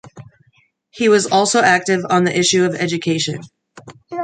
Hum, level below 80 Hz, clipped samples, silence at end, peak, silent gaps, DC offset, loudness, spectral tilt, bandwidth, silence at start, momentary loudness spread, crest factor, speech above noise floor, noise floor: none; -62 dBFS; under 0.1%; 0 s; -2 dBFS; none; under 0.1%; -15 LUFS; -3.5 dB/octave; 9.6 kHz; 0.05 s; 8 LU; 16 dB; 43 dB; -59 dBFS